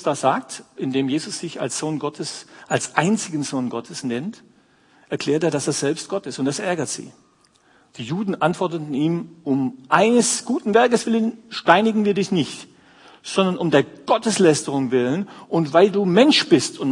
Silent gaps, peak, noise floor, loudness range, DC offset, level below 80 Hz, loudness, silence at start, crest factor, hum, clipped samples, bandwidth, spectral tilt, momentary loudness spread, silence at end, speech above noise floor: none; 0 dBFS; -58 dBFS; 7 LU; under 0.1%; -68 dBFS; -20 LUFS; 0 s; 20 dB; none; under 0.1%; 11 kHz; -4.5 dB/octave; 12 LU; 0 s; 38 dB